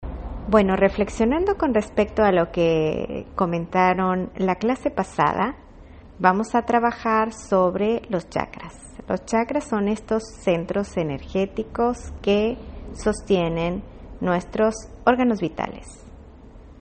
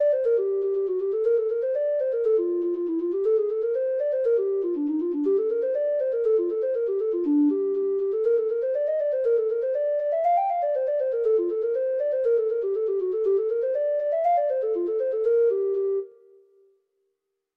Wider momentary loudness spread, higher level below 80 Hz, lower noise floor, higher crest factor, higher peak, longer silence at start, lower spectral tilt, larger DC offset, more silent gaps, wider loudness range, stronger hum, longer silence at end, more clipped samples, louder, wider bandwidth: first, 10 LU vs 3 LU; first, -42 dBFS vs -74 dBFS; second, -44 dBFS vs -79 dBFS; first, 20 dB vs 10 dB; first, -2 dBFS vs -14 dBFS; about the same, 0 s vs 0 s; about the same, -6.5 dB/octave vs -7.5 dB/octave; neither; neither; first, 4 LU vs 1 LU; neither; second, 0.1 s vs 1.5 s; neither; about the same, -22 LUFS vs -24 LUFS; first, 8.8 kHz vs 3.6 kHz